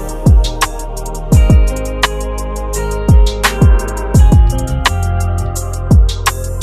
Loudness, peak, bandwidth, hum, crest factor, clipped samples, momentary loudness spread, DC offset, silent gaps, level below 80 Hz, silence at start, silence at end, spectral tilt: -13 LUFS; 0 dBFS; 14 kHz; none; 12 dB; 0.3%; 11 LU; under 0.1%; none; -14 dBFS; 0 s; 0 s; -5.5 dB/octave